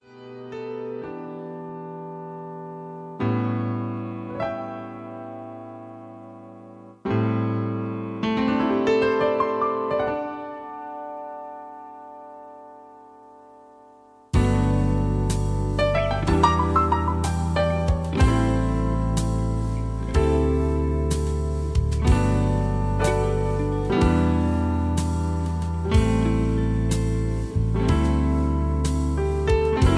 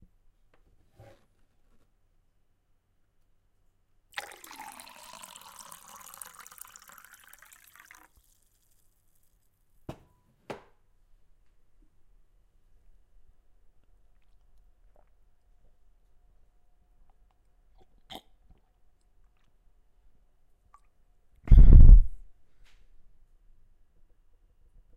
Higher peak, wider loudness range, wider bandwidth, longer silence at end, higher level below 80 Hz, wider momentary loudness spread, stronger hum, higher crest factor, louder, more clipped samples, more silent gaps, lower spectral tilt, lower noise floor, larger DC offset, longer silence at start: about the same, -6 dBFS vs -4 dBFS; second, 10 LU vs 28 LU; about the same, 11 kHz vs 10.5 kHz; second, 0 s vs 2.9 s; about the same, -30 dBFS vs -28 dBFS; second, 17 LU vs 30 LU; neither; second, 18 dB vs 24 dB; about the same, -23 LUFS vs -21 LUFS; neither; neither; about the same, -7 dB/octave vs -7 dB/octave; second, -51 dBFS vs -69 dBFS; neither; second, 0.1 s vs 21.5 s